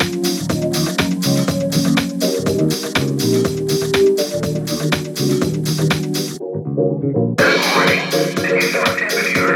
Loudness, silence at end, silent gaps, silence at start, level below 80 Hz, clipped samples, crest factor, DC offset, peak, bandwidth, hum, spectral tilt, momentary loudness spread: -17 LUFS; 0 s; none; 0 s; -46 dBFS; under 0.1%; 14 dB; under 0.1%; -2 dBFS; 18.5 kHz; none; -4.5 dB/octave; 6 LU